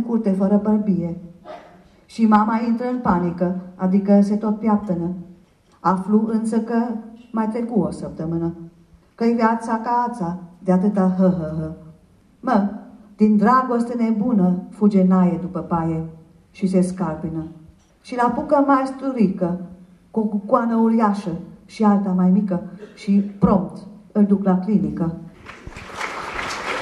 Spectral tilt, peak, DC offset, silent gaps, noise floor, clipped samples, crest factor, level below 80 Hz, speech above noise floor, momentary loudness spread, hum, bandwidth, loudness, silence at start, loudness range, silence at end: -8.5 dB/octave; -2 dBFS; under 0.1%; none; -53 dBFS; under 0.1%; 18 dB; -50 dBFS; 34 dB; 16 LU; none; 10.5 kHz; -20 LUFS; 0 s; 4 LU; 0 s